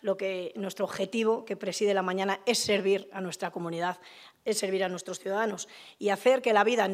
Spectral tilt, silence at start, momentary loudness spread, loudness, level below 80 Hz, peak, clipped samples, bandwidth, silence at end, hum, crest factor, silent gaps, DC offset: -3.5 dB/octave; 0.05 s; 11 LU; -29 LUFS; -78 dBFS; -10 dBFS; under 0.1%; 15.5 kHz; 0 s; none; 20 dB; none; under 0.1%